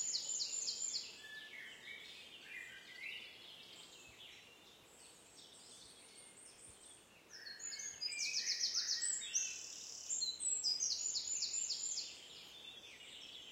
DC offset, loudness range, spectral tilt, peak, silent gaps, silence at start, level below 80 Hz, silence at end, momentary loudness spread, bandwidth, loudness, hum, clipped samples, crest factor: under 0.1%; 19 LU; 2.5 dB/octave; -24 dBFS; none; 0 s; -82 dBFS; 0 s; 21 LU; 16 kHz; -40 LUFS; none; under 0.1%; 22 dB